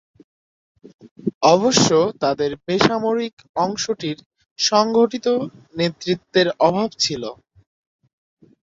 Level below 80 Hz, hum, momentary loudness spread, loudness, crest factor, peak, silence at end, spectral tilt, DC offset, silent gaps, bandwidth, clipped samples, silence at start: -56 dBFS; none; 13 LU; -19 LUFS; 20 dB; 0 dBFS; 1.3 s; -4 dB/octave; under 0.1%; 1.11-1.16 s, 1.34-1.41 s, 3.33-3.37 s, 3.49-3.54 s, 4.26-4.31 s, 4.51-4.56 s; 8 kHz; under 0.1%; 1.05 s